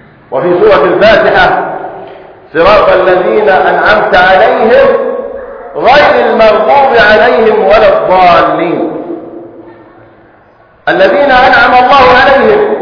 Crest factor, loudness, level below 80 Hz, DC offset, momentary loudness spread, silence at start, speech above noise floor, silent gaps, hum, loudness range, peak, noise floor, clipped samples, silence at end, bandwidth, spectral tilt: 6 dB; -5 LUFS; -34 dBFS; under 0.1%; 14 LU; 0.3 s; 36 dB; none; none; 4 LU; 0 dBFS; -41 dBFS; 5%; 0 s; 5.4 kHz; -6 dB/octave